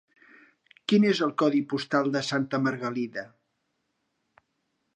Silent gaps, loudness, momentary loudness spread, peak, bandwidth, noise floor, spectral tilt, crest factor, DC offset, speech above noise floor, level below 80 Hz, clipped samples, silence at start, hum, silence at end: none; -26 LUFS; 13 LU; -10 dBFS; 9.8 kHz; -77 dBFS; -5.5 dB/octave; 18 dB; under 0.1%; 52 dB; -76 dBFS; under 0.1%; 0.9 s; none; 1.7 s